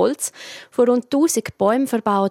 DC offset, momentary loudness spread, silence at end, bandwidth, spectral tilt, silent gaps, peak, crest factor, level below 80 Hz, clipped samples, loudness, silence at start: under 0.1%; 9 LU; 0 s; 16.5 kHz; -4.5 dB/octave; none; -4 dBFS; 16 dB; -64 dBFS; under 0.1%; -19 LUFS; 0 s